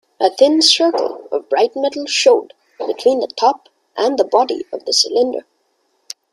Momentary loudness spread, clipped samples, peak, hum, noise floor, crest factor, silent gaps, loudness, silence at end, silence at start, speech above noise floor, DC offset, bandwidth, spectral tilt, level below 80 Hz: 15 LU; under 0.1%; 0 dBFS; none; -64 dBFS; 16 dB; none; -15 LUFS; 0.95 s; 0.2 s; 49 dB; under 0.1%; 12.5 kHz; -0.5 dB/octave; -66 dBFS